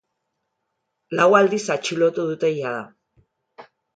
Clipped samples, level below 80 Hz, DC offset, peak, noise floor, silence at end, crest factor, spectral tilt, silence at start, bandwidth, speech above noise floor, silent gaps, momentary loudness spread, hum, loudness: under 0.1%; -72 dBFS; under 0.1%; -2 dBFS; -77 dBFS; 0.35 s; 22 dB; -4.5 dB/octave; 1.1 s; 9.2 kHz; 57 dB; none; 14 LU; none; -20 LUFS